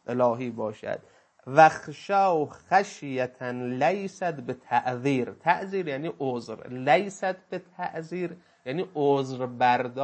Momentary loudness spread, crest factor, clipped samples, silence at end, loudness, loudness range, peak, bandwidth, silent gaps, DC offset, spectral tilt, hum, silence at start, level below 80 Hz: 12 LU; 24 dB; under 0.1%; 0 s; -27 LUFS; 4 LU; -4 dBFS; 8.6 kHz; none; under 0.1%; -6 dB/octave; none; 0.1 s; -74 dBFS